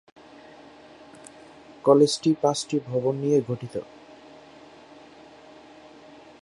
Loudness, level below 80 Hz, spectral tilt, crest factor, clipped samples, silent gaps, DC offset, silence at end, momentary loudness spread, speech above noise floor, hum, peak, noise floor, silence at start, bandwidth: -23 LUFS; -68 dBFS; -5.5 dB/octave; 24 dB; under 0.1%; none; under 0.1%; 2.6 s; 28 LU; 26 dB; none; -4 dBFS; -49 dBFS; 1.85 s; 11.5 kHz